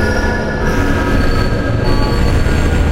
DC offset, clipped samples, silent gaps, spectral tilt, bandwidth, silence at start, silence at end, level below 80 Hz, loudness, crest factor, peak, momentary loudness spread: under 0.1%; under 0.1%; none; -6.5 dB/octave; 15.5 kHz; 0 s; 0 s; -16 dBFS; -15 LUFS; 12 dB; 0 dBFS; 2 LU